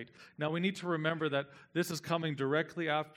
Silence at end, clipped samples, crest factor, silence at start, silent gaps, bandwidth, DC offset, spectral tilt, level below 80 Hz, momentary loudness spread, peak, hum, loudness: 0.05 s; under 0.1%; 18 dB; 0 s; none; 16.5 kHz; under 0.1%; -5.5 dB/octave; -80 dBFS; 5 LU; -16 dBFS; none; -35 LUFS